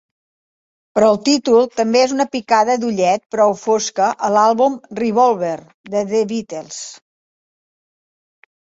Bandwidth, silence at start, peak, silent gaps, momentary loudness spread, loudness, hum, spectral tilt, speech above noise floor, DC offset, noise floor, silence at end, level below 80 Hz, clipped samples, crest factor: 8 kHz; 0.95 s; -2 dBFS; 3.26-3.30 s, 5.74-5.84 s; 11 LU; -16 LUFS; none; -4 dB/octave; over 74 dB; under 0.1%; under -90 dBFS; 1.7 s; -62 dBFS; under 0.1%; 16 dB